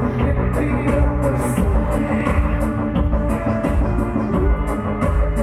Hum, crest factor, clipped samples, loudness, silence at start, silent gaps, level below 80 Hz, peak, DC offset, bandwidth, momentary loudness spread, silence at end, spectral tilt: none; 14 dB; under 0.1%; -20 LUFS; 0 s; none; -22 dBFS; -4 dBFS; under 0.1%; 13.5 kHz; 2 LU; 0 s; -8 dB/octave